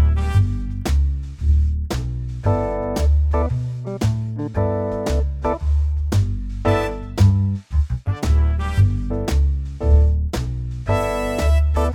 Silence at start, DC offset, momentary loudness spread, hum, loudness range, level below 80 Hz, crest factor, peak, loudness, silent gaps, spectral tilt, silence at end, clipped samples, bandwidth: 0 s; under 0.1%; 7 LU; none; 2 LU; -20 dBFS; 16 dB; -4 dBFS; -21 LUFS; none; -7.5 dB/octave; 0 s; under 0.1%; 12.5 kHz